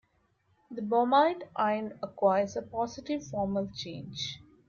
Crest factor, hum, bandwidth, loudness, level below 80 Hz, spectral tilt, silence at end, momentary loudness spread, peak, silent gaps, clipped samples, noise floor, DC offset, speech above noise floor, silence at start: 18 dB; none; 7.2 kHz; -30 LUFS; -64 dBFS; -5.5 dB/octave; 0.3 s; 14 LU; -12 dBFS; none; under 0.1%; -71 dBFS; under 0.1%; 42 dB; 0.7 s